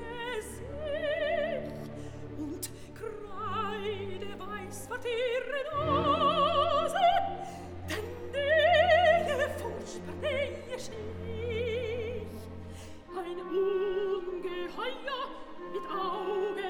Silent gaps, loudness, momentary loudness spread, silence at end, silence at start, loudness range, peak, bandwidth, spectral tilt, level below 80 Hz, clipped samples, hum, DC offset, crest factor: none; -31 LUFS; 16 LU; 0 s; 0 s; 9 LU; -12 dBFS; 18.5 kHz; -4.5 dB/octave; -54 dBFS; under 0.1%; none; under 0.1%; 20 dB